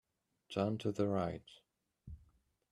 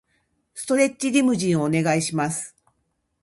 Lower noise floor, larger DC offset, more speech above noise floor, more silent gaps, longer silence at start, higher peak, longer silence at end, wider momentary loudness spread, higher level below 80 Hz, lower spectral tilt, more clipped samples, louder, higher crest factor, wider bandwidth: about the same, -72 dBFS vs -73 dBFS; neither; second, 35 dB vs 52 dB; neither; about the same, 0.5 s vs 0.55 s; second, -22 dBFS vs -6 dBFS; second, 0.55 s vs 0.75 s; first, 21 LU vs 14 LU; about the same, -64 dBFS vs -62 dBFS; first, -7.5 dB/octave vs -5 dB/octave; neither; second, -38 LUFS vs -22 LUFS; about the same, 20 dB vs 18 dB; about the same, 12 kHz vs 12 kHz